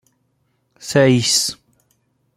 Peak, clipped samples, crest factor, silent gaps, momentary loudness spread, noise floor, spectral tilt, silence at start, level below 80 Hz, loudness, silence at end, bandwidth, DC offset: -2 dBFS; under 0.1%; 18 dB; none; 22 LU; -66 dBFS; -4 dB/octave; 0.8 s; -58 dBFS; -16 LUFS; 0.85 s; 16.5 kHz; under 0.1%